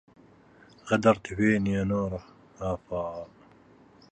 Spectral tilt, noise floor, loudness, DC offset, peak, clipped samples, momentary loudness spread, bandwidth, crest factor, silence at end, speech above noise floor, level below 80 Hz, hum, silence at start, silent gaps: -7 dB/octave; -56 dBFS; -27 LUFS; under 0.1%; -8 dBFS; under 0.1%; 17 LU; 8.8 kHz; 22 dB; 0.85 s; 29 dB; -52 dBFS; none; 0.85 s; none